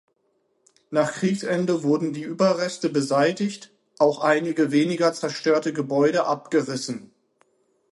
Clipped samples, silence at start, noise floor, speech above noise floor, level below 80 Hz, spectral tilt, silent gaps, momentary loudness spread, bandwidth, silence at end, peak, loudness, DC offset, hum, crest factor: under 0.1%; 0.9 s; -69 dBFS; 47 dB; -72 dBFS; -5.5 dB/octave; none; 8 LU; 11.5 kHz; 0.85 s; -4 dBFS; -23 LUFS; under 0.1%; none; 18 dB